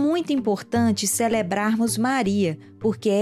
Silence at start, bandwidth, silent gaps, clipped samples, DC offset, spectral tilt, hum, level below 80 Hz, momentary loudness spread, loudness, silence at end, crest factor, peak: 0 s; 16 kHz; none; under 0.1%; under 0.1%; -4.5 dB/octave; none; -58 dBFS; 4 LU; -22 LUFS; 0 s; 12 dB; -10 dBFS